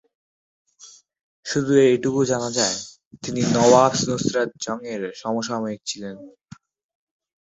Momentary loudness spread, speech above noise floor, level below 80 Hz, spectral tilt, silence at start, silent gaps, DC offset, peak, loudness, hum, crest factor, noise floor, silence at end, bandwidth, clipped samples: 17 LU; 28 dB; -60 dBFS; -4.5 dB/octave; 0.85 s; 1.23-1.43 s, 3.07-3.11 s; under 0.1%; -2 dBFS; -21 LUFS; none; 22 dB; -49 dBFS; 1.1 s; 8.4 kHz; under 0.1%